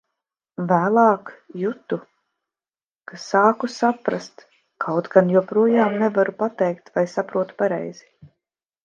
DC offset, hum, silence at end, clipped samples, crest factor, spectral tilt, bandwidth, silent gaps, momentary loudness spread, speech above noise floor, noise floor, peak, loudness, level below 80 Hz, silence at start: under 0.1%; none; 0.9 s; under 0.1%; 22 dB; -7 dB/octave; 7.6 kHz; none; 14 LU; over 70 dB; under -90 dBFS; 0 dBFS; -21 LUFS; -72 dBFS; 0.6 s